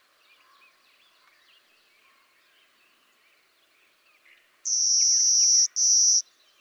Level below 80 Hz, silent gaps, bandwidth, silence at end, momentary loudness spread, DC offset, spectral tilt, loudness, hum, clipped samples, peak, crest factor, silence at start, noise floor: under -90 dBFS; none; 19.5 kHz; 0.4 s; 11 LU; under 0.1%; 8 dB/octave; -18 LUFS; none; under 0.1%; -10 dBFS; 18 dB; 4.65 s; -64 dBFS